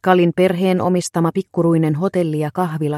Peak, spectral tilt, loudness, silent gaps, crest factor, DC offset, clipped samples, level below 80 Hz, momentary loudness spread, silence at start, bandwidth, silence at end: 0 dBFS; -7 dB/octave; -17 LUFS; none; 16 dB; under 0.1%; under 0.1%; -60 dBFS; 5 LU; 0.05 s; 13.5 kHz; 0 s